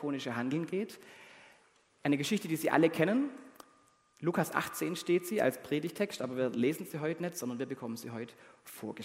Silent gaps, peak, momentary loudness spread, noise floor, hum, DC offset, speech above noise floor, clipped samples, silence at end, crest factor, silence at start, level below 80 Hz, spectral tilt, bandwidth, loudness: none; -10 dBFS; 16 LU; -67 dBFS; none; under 0.1%; 33 dB; under 0.1%; 0 s; 24 dB; 0 s; -78 dBFS; -5.5 dB/octave; 16 kHz; -34 LUFS